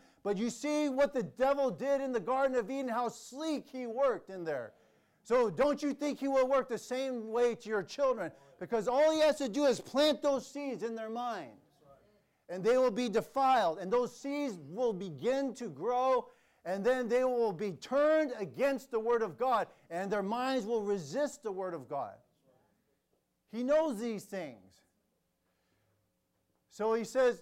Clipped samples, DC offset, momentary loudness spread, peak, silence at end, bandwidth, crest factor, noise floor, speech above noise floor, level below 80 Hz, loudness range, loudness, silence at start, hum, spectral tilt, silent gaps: under 0.1%; under 0.1%; 11 LU; -20 dBFS; 0 s; 16 kHz; 14 dB; -79 dBFS; 47 dB; -70 dBFS; 7 LU; -33 LUFS; 0.25 s; none; -5 dB/octave; none